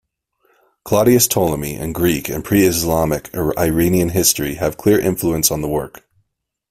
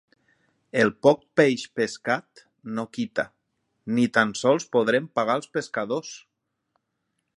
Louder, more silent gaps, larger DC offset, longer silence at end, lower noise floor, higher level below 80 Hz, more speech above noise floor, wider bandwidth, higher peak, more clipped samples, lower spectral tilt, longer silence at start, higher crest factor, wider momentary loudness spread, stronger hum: first, -16 LUFS vs -24 LUFS; neither; neither; second, 0.8 s vs 1.2 s; second, -71 dBFS vs -78 dBFS; first, -40 dBFS vs -70 dBFS; about the same, 54 dB vs 54 dB; first, 16 kHz vs 11.5 kHz; first, 0 dBFS vs -4 dBFS; neither; about the same, -4.5 dB/octave vs -5 dB/octave; about the same, 0.85 s vs 0.75 s; about the same, 18 dB vs 22 dB; second, 8 LU vs 13 LU; neither